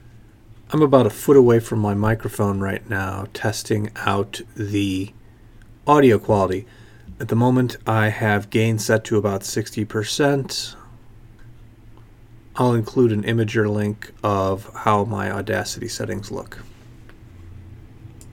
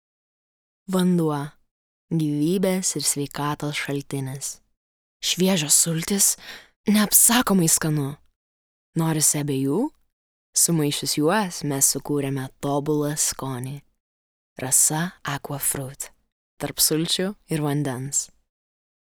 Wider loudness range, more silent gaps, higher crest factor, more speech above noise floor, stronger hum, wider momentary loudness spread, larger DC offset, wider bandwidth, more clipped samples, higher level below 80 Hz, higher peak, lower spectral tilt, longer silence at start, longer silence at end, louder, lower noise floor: about the same, 6 LU vs 6 LU; second, none vs 1.71-2.08 s, 4.77-5.20 s, 6.76-6.84 s, 8.36-8.93 s, 10.13-10.53 s, 14.00-14.56 s, 16.32-16.57 s; about the same, 20 dB vs 24 dB; second, 26 dB vs over 67 dB; neither; about the same, 13 LU vs 14 LU; neither; second, 17 kHz vs over 20 kHz; neither; first, -48 dBFS vs -56 dBFS; about the same, 0 dBFS vs 0 dBFS; first, -6 dB/octave vs -3.5 dB/octave; second, 0.15 s vs 0.9 s; second, 0 s vs 0.9 s; about the same, -20 LUFS vs -21 LUFS; second, -46 dBFS vs under -90 dBFS